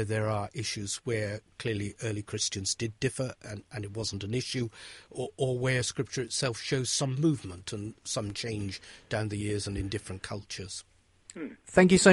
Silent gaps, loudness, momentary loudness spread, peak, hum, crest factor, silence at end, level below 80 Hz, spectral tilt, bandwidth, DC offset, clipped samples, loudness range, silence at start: none; -31 LUFS; 11 LU; -4 dBFS; none; 26 dB; 0 s; -54 dBFS; -4.5 dB/octave; 11.5 kHz; under 0.1%; under 0.1%; 5 LU; 0 s